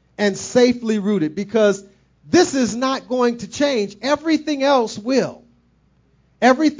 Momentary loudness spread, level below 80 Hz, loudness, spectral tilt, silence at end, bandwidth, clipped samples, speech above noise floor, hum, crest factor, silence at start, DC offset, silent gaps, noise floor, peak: 5 LU; -56 dBFS; -19 LUFS; -4.5 dB/octave; 0.05 s; 7.6 kHz; under 0.1%; 41 dB; none; 18 dB; 0.2 s; under 0.1%; none; -58 dBFS; -2 dBFS